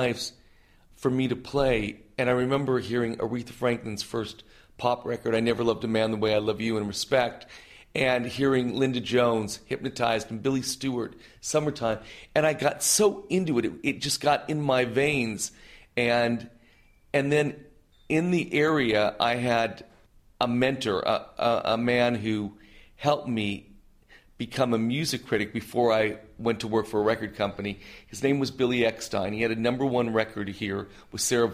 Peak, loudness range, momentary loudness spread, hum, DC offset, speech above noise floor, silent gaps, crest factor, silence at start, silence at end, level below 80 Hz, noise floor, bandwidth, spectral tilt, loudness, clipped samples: -6 dBFS; 3 LU; 9 LU; none; under 0.1%; 32 dB; none; 20 dB; 0 s; 0 s; -54 dBFS; -58 dBFS; 15.5 kHz; -4.5 dB/octave; -27 LUFS; under 0.1%